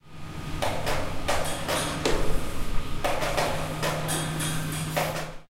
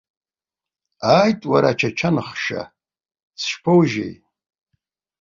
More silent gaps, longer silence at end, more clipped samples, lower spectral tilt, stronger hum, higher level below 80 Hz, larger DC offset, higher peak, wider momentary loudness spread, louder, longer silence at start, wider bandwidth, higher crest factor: second, none vs 3.23-3.31 s; second, 0.05 s vs 1.1 s; neither; second, -4 dB/octave vs -6 dB/octave; neither; first, -34 dBFS vs -58 dBFS; neither; second, -10 dBFS vs -2 dBFS; second, 7 LU vs 12 LU; second, -29 LUFS vs -19 LUFS; second, 0.05 s vs 1 s; first, 16.5 kHz vs 7.4 kHz; about the same, 16 dB vs 20 dB